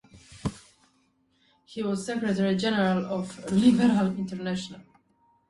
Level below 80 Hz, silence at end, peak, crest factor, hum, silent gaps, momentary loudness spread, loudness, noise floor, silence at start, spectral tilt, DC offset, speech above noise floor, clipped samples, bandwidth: -58 dBFS; 0.65 s; -8 dBFS; 18 dB; none; none; 15 LU; -26 LUFS; -68 dBFS; 0.15 s; -6 dB/octave; under 0.1%; 43 dB; under 0.1%; 11.5 kHz